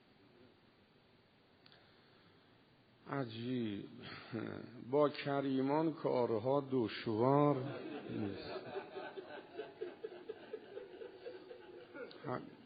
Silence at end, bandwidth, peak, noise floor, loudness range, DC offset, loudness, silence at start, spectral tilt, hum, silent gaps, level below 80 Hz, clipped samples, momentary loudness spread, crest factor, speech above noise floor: 0 s; 4.9 kHz; -18 dBFS; -69 dBFS; 15 LU; under 0.1%; -39 LUFS; 0.4 s; -6 dB/octave; none; none; -80 dBFS; under 0.1%; 17 LU; 22 dB; 31 dB